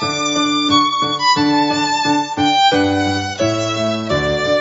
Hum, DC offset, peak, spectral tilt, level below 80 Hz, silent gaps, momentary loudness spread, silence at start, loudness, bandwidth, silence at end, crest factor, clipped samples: none; under 0.1%; 0 dBFS; -3.5 dB/octave; -46 dBFS; none; 5 LU; 0 s; -15 LUFS; 8 kHz; 0 s; 14 dB; under 0.1%